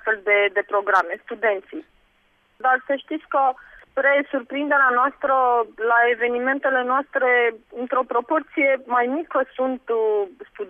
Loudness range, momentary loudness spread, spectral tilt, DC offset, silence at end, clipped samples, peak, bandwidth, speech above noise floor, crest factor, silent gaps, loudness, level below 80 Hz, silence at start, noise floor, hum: 4 LU; 9 LU; -4.5 dB/octave; under 0.1%; 0 s; under 0.1%; -6 dBFS; 6.6 kHz; 41 dB; 16 dB; none; -21 LUFS; -66 dBFS; 0.05 s; -62 dBFS; none